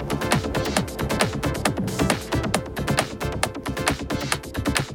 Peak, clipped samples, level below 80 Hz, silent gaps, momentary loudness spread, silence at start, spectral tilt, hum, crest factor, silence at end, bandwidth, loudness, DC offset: -2 dBFS; under 0.1%; -36 dBFS; none; 4 LU; 0 s; -4.5 dB/octave; none; 22 dB; 0 s; over 20 kHz; -24 LUFS; under 0.1%